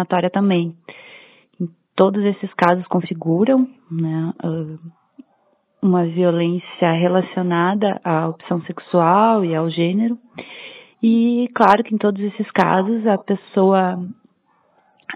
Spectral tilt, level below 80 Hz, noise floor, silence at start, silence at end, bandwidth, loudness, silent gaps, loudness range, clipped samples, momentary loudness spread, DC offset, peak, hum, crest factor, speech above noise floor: -9 dB/octave; -68 dBFS; -62 dBFS; 0 s; 0 s; 6 kHz; -18 LUFS; none; 3 LU; under 0.1%; 14 LU; under 0.1%; 0 dBFS; none; 18 dB; 44 dB